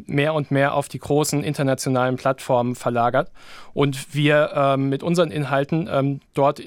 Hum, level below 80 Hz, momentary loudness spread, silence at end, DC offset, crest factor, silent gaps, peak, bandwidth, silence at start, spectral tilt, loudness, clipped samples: none; -56 dBFS; 5 LU; 0 s; under 0.1%; 16 dB; none; -4 dBFS; 17 kHz; 0 s; -6 dB/octave; -21 LUFS; under 0.1%